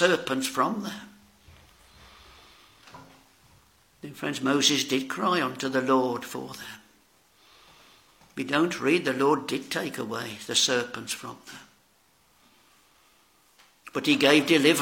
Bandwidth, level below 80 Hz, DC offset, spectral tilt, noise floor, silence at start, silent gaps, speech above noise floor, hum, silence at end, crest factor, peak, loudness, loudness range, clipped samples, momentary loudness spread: 17 kHz; -68 dBFS; under 0.1%; -3 dB/octave; -64 dBFS; 0 s; none; 38 dB; none; 0 s; 24 dB; -4 dBFS; -25 LUFS; 9 LU; under 0.1%; 21 LU